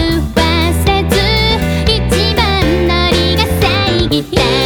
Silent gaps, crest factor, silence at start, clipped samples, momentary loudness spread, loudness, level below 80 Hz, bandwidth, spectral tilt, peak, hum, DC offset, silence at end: none; 12 dB; 0 s; under 0.1%; 2 LU; -12 LUFS; -20 dBFS; 20 kHz; -5 dB/octave; 0 dBFS; none; under 0.1%; 0 s